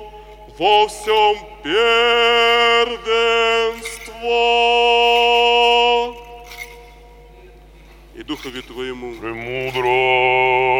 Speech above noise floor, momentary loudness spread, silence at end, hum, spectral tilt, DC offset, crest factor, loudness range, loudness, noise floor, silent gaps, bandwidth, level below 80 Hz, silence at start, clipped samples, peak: 26 dB; 16 LU; 0 s; none; -2.5 dB/octave; under 0.1%; 14 dB; 14 LU; -15 LUFS; -43 dBFS; none; 16.5 kHz; -44 dBFS; 0 s; under 0.1%; -2 dBFS